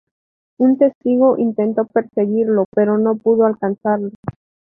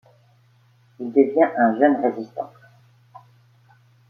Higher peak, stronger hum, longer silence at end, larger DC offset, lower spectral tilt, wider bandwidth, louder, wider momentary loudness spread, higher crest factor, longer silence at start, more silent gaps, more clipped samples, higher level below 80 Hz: about the same, -2 dBFS vs -4 dBFS; neither; second, 0.35 s vs 1.65 s; neither; first, -12.5 dB/octave vs -8.5 dB/octave; second, 3.1 kHz vs 4.8 kHz; first, -16 LUFS vs -20 LUFS; second, 7 LU vs 17 LU; second, 14 dB vs 20 dB; second, 0.6 s vs 1 s; first, 0.95-1.01 s, 2.65-2.72 s, 4.15-4.23 s vs none; neither; first, -58 dBFS vs -74 dBFS